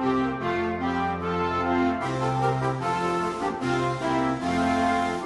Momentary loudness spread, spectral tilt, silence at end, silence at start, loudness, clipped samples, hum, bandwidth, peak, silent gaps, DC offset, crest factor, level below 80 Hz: 3 LU; -6.5 dB/octave; 0 s; 0 s; -26 LUFS; under 0.1%; none; 11.5 kHz; -12 dBFS; none; under 0.1%; 14 dB; -50 dBFS